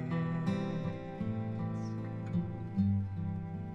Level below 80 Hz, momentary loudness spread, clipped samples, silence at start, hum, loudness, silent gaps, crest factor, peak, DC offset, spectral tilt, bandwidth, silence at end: -58 dBFS; 7 LU; under 0.1%; 0 s; none; -36 LUFS; none; 14 dB; -20 dBFS; under 0.1%; -9 dB/octave; 7.6 kHz; 0 s